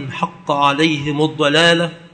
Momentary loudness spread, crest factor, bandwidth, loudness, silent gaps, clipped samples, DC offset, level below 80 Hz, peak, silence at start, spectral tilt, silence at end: 9 LU; 16 dB; 9.2 kHz; -15 LUFS; none; under 0.1%; under 0.1%; -54 dBFS; 0 dBFS; 0 s; -4.5 dB/octave; 0.05 s